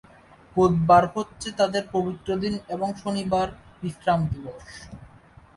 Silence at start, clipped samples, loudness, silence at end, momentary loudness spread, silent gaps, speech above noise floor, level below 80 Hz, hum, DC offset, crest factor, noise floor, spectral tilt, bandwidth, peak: 0.55 s; under 0.1%; -24 LUFS; 0.5 s; 19 LU; none; 28 dB; -48 dBFS; none; under 0.1%; 22 dB; -52 dBFS; -6.5 dB/octave; 11.5 kHz; -4 dBFS